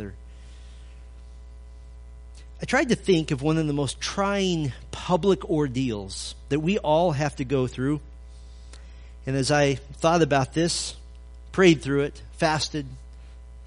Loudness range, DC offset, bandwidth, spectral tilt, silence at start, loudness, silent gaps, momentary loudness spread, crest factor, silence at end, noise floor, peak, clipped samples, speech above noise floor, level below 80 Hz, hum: 4 LU; under 0.1%; 10.5 kHz; -5 dB/octave; 0 s; -24 LUFS; none; 24 LU; 20 dB; 0 s; -43 dBFS; -4 dBFS; under 0.1%; 19 dB; -42 dBFS; none